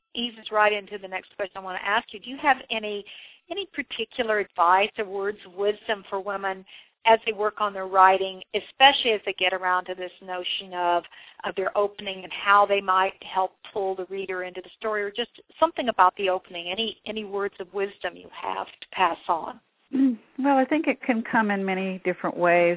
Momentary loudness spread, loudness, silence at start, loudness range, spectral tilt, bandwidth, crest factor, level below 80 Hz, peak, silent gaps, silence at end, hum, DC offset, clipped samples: 14 LU; -25 LUFS; 0.15 s; 6 LU; -7.5 dB/octave; 4 kHz; 22 dB; -66 dBFS; -2 dBFS; none; 0 s; none; under 0.1%; under 0.1%